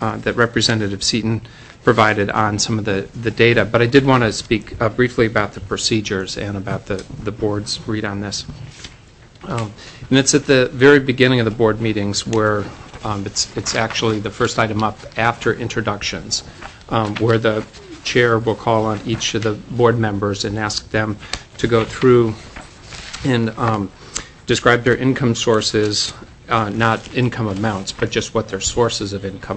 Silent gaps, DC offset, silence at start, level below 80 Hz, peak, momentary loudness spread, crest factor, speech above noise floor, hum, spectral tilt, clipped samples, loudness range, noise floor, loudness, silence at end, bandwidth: none; under 0.1%; 0 s; -42 dBFS; 0 dBFS; 13 LU; 18 dB; 26 dB; none; -4.5 dB/octave; under 0.1%; 5 LU; -44 dBFS; -18 LUFS; 0 s; 8.6 kHz